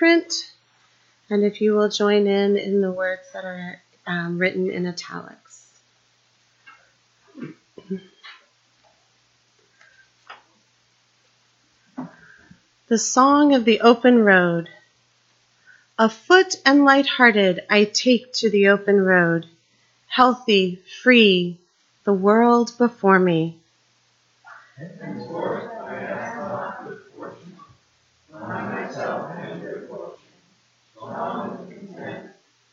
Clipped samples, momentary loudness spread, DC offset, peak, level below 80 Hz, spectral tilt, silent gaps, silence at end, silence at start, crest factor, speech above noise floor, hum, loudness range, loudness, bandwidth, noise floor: under 0.1%; 23 LU; under 0.1%; 0 dBFS; -70 dBFS; -4.5 dB/octave; none; 0.45 s; 0 s; 20 dB; 45 dB; none; 18 LU; -19 LUFS; 8 kHz; -63 dBFS